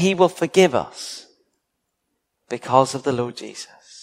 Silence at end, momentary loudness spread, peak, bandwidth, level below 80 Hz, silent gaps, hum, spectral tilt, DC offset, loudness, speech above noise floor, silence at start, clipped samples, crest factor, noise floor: 0.4 s; 19 LU; 0 dBFS; 15 kHz; -62 dBFS; none; none; -5 dB/octave; under 0.1%; -19 LUFS; 56 dB; 0 s; under 0.1%; 22 dB; -76 dBFS